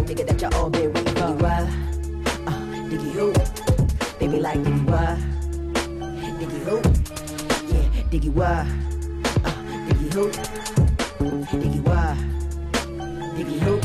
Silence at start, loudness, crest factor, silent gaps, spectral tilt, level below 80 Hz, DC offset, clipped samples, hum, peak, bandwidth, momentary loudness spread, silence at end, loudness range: 0 s; -24 LUFS; 14 dB; none; -6 dB/octave; -26 dBFS; under 0.1%; under 0.1%; none; -8 dBFS; 13.5 kHz; 8 LU; 0 s; 1 LU